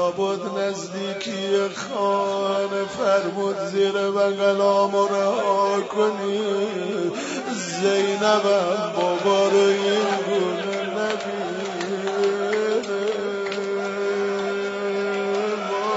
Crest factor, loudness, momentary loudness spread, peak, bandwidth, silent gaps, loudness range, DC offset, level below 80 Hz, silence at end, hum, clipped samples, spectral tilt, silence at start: 16 dB; -23 LUFS; 8 LU; -6 dBFS; 8 kHz; none; 4 LU; under 0.1%; -72 dBFS; 0 s; none; under 0.1%; -4 dB/octave; 0 s